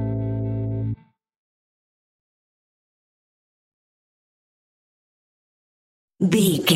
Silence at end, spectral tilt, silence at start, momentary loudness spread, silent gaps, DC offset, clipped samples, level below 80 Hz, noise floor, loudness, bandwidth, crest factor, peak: 0 s; -5 dB/octave; 0 s; 11 LU; 1.36-6.08 s; under 0.1%; under 0.1%; -50 dBFS; under -90 dBFS; -23 LUFS; 16 kHz; 24 dB; -4 dBFS